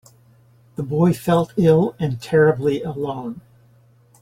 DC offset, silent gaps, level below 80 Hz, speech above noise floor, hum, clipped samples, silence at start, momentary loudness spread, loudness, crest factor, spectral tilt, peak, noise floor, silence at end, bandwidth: under 0.1%; none; -52 dBFS; 35 dB; none; under 0.1%; 0.8 s; 16 LU; -19 LUFS; 16 dB; -8 dB/octave; -4 dBFS; -53 dBFS; 0.8 s; 16 kHz